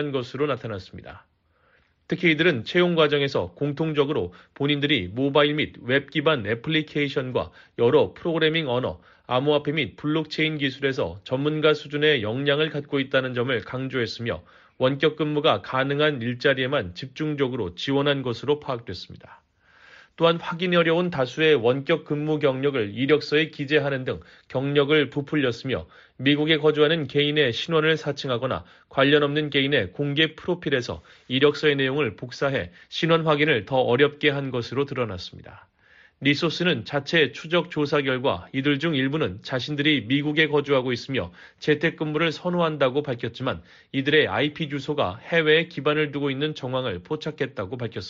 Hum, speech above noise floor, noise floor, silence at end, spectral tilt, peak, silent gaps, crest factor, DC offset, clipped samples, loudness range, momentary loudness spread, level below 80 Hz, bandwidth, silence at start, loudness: none; 39 dB; -63 dBFS; 0 s; -3.5 dB/octave; -6 dBFS; none; 18 dB; under 0.1%; under 0.1%; 3 LU; 10 LU; -58 dBFS; 7.4 kHz; 0 s; -23 LUFS